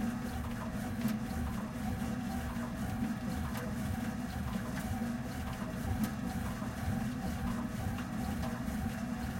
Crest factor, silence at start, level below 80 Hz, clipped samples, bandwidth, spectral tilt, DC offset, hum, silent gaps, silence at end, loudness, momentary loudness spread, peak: 16 dB; 0 s; -46 dBFS; under 0.1%; 16.5 kHz; -6 dB/octave; under 0.1%; none; none; 0 s; -38 LUFS; 3 LU; -20 dBFS